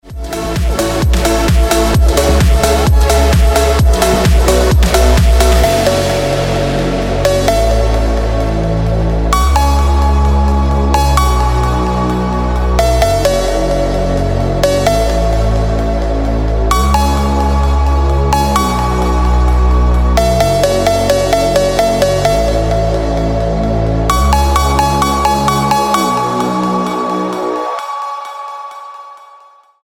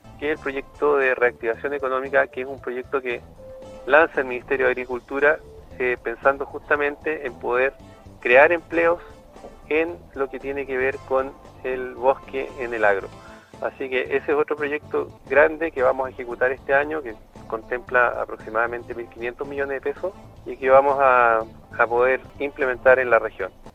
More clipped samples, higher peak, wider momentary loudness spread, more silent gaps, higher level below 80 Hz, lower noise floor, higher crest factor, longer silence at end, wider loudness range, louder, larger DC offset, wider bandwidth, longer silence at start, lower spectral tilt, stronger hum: neither; about the same, -2 dBFS vs 0 dBFS; second, 5 LU vs 14 LU; neither; first, -14 dBFS vs -50 dBFS; about the same, -42 dBFS vs -43 dBFS; second, 10 dB vs 22 dB; first, 0.65 s vs 0.05 s; about the same, 3 LU vs 5 LU; first, -12 LUFS vs -22 LUFS; neither; first, 17 kHz vs 9.4 kHz; about the same, 0.05 s vs 0.05 s; about the same, -5.5 dB/octave vs -6 dB/octave; neither